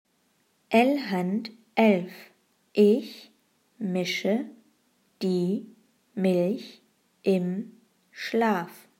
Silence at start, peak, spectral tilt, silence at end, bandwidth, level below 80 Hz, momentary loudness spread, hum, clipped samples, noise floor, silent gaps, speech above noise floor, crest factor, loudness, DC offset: 0.7 s; -6 dBFS; -6.5 dB/octave; 0.25 s; 16 kHz; -82 dBFS; 17 LU; none; under 0.1%; -69 dBFS; none; 44 dB; 20 dB; -26 LUFS; under 0.1%